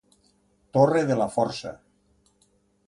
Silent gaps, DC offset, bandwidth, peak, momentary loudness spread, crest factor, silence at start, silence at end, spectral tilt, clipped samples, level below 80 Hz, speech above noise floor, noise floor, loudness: none; under 0.1%; 11.5 kHz; -6 dBFS; 14 LU; 20 dB; 0.75 s; 1.1 s; -6.5 dB/octave; under 0.1%; -62 dBFS; 43 dB; -66 dBFS; -24 LUFS